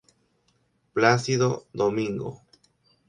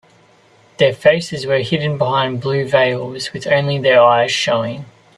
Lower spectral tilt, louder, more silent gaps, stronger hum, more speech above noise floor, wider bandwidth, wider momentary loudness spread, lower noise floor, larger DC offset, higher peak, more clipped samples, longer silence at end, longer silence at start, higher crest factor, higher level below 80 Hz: about the same, -5.5 dB/octave vs -5 dB/octave; second, -24 LUFS vs -15 LUFS; neither; neither; first, 45 dB vs 35 dB; second, 10.5 kHz vs 12 kHz; about the same, 12 LU vs 11 LU; first, -68 dBFS vs -50 dBFS; neither; second, -4 dBFS vs 0 dBFS; neither; first, 0.7 s vs 0.3 s; first, 0.95 s vs 0.8 s; first, 24 dB vs 16 dB; second, -64 dBFS vs -56 dBFS